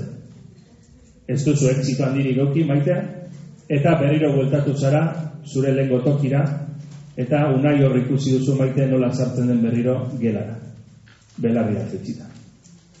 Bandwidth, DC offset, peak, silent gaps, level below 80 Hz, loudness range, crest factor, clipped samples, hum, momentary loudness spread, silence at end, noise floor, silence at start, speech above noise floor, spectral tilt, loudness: 8 kHz; under 0.1%; -6 dBFS; none; -56 dBFS; 3 LU; 14 dB; under 0.1%; none; 16 LU; 0.6 s; -49 dBFS; 0 s; 30 dB; -8 dB/octave; -20 LUFS